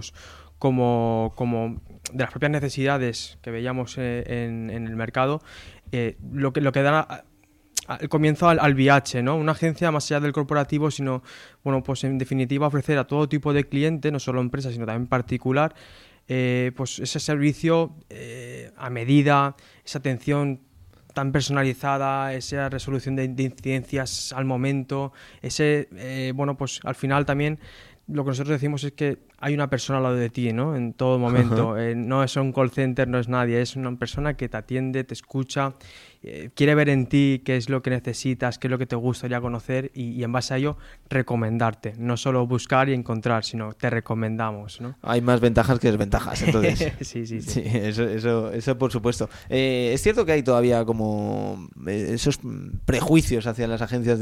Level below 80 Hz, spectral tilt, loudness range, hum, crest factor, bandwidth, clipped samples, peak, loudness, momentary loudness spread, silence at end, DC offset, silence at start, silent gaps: -44 dBFS; -6 dB/octave; 4 LU; none; 20 dB; 14.5 kHz; under 0.1%; -4 dBFS; -24 LUFS; 11 LU; 0 s; under 0.1%; 0 s; none